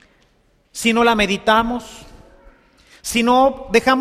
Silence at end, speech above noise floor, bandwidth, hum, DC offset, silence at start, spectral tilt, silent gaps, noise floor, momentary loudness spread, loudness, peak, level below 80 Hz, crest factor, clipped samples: 0 s; 42 dB; 15.5 kHz; none; under 0.1%; 0.75 s; -3.5 dB/octave; none; -59 dBFS; 15 LU; -16 LUFS; -2 dBFS; -42 dBFS; 18 dB; under 0.1%